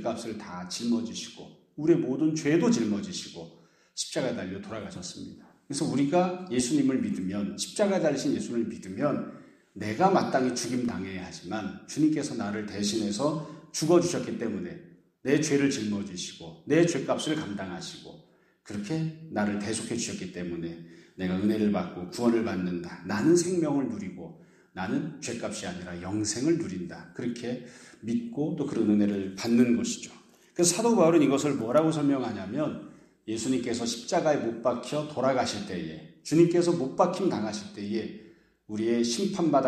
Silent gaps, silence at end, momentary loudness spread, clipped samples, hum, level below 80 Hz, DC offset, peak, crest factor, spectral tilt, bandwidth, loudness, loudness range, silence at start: none; 0 s; 15 LU; under 0.1%; none; -66 dBFS; under 0.1%; -8 dBFS; 20 dB; -5 dB/octave; 14 kHz; -28 LUFS; 6 LU; 0 s